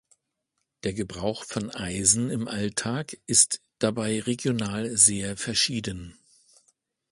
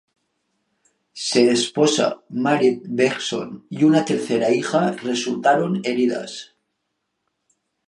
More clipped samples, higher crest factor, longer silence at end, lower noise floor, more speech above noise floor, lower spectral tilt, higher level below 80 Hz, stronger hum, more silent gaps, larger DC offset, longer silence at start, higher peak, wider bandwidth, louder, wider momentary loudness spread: neither; first, 24 dB vs 18 dB; second, 1 s vs 1.45 s; first, -80 dBFS vs -76 dBFS; about the same, 54 dB vs 56 dB; second, -3 dB/octave vs -4.5 dB/octave; first, -54 dBFS vs -70 dBFS; neither; neither; neither; second, 0.85 s vs 1.15 s; about the same, -4 dBFS vs -2 dBFS; about the same, 11.5 kHz vs 11.5 kHz; second, -24 LUFS vs -20 LUFS; first, 14 LU vs 10 LU